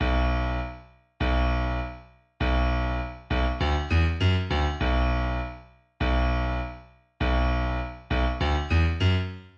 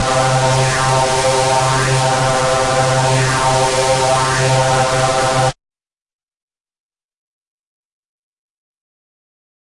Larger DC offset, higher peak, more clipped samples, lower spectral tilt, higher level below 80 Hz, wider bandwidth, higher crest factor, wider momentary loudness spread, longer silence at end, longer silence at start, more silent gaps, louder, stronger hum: neither; second, -12 dBFS vs -2 dBFS; neither; first, -7 dB/octave vs -3.5 dB/octave; first, -28 dBFS vs -38 dBFS; second, 7 kHz vs 11.5 kHz; about the same, 14 dB vs 14 dB; first, 9 LU vs 1 LU; second, 0.1 s vs 4.1 s; about the same, 0 s vs 0 s; neither; second, -27 LUFS vs -14 LUFS; neither